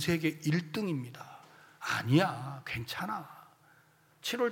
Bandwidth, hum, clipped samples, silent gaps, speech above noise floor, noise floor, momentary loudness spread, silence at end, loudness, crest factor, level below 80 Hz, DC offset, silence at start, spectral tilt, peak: 17 kHz; none; under 0.1%; none; 32 dB; -65 dBFS; 20 LU; 0 s; -33 LUFS; 22 dB; -66 dBFS; under 0.1%; 0 s; -5.5 dB/octave; -12 dBFS